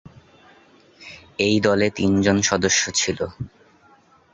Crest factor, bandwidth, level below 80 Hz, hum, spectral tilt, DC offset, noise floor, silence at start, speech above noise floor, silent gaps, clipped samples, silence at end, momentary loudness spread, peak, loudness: 20 dB; 8.2 kHz; -48 dBFS; none; -3.5 dB/octave; under 0.1%; -55 dBFS; 0.05 s; 35 dB; none; under 0.1%; 0.85 s; 19 LU; -4 dBFS; -20 LUFS